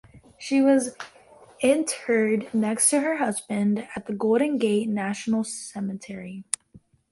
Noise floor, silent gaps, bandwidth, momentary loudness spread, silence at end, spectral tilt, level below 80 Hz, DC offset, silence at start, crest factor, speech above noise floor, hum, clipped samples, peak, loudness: -55 dBFS; none; 12 kHz; 13 LU; 0.35 s; -4 dB/octave; -66 dBFS; under 0.1%; 0.15 s; 20 dB; 31 dB; none; under 0.1%; -4 dBFS; -24 LUFS